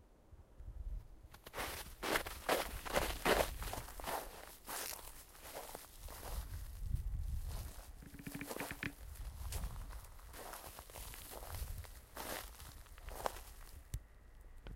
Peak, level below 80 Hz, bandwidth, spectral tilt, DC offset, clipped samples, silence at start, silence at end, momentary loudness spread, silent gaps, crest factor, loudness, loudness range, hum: -18 dBFS; -50 dBFS; 16.5 kHz; -3.5 dB/octave; under 0.1%; under 0.1%; 0 s; 0 s; 17 LU; none; 28 dB; -44 LUFS; 10 LU; none